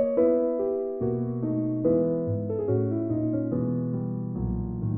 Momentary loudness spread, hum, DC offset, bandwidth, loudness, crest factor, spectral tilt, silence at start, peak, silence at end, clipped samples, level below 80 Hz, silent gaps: 7 LU; none; under 0.1%; 2.5 kHz; -27 LUFS; 14 dB; -14 dB/octave; 0 s; -12 dBFS; 0 s; under 0.1%; -46 dBFS; none